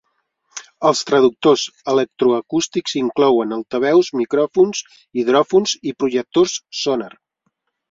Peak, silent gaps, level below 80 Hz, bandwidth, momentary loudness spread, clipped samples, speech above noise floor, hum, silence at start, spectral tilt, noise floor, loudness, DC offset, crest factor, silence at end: -2 dBFS; none; -62 dBFS; 7.8 kHz; 8 LU; under 0.1%; 54 dB; none; 0.55 s; -4 dB/octave; -71 dBFS; -17 LUFS; under 0.1%; 16 dB; 0.85 s